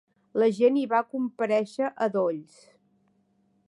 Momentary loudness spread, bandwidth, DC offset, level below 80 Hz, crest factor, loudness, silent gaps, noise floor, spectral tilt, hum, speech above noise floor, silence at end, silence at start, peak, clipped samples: 9 LU; 11 kHz; under 0.1%; -82 dBFS; 18 dB; -26 LUFS; none; -68 dBFS; -6.5 dB/octave; none; 43 dB; 1.25 s; 0.35 s; -10 dBFS; under 0.1%